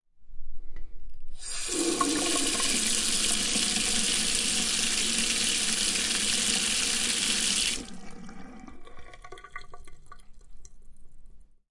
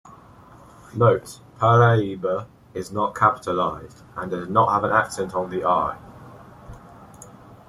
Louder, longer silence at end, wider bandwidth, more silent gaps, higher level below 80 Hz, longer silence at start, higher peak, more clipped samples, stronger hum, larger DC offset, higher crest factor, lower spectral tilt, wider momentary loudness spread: second, -25 LUFS vs -21 LUFS; second, 0.15 s vs 0.4 s; second, 11.5 kHz vs 13 kHz; neither; first, -44 dBFS vs -54 dBFS; second, 0.15 s vs 0.95 s; second, -10 dBFS vs -4 dBFS; neither; neither; neither; about the same, 20 dB vs 20 dB; second, -0.5 dB/octave vs -6.5 dB/octave; about the same, 20 LU vs 18 LU